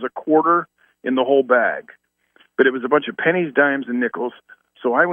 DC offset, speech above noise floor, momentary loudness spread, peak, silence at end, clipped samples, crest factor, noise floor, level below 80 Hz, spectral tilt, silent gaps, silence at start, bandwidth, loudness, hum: under 0.1%; 40 dB; 13 LU; -2 dBFS; 0 s; under 0.1%; 18 dB; -58 dBFS; -76 dBFS; -8.5 dB/octave; none; 0 s; 3.7 kHz; -19 LUFS; none